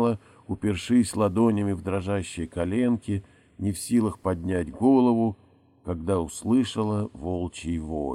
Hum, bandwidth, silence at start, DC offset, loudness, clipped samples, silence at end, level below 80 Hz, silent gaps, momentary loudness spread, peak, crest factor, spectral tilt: none; 13.5 kHz; 0 s; under 0.1%; -26 LUFS; under 0.1%; 0 s; -48 dBFS; none; 11 LU; -8 dBFS; 16 dB; -6.5 dB/octave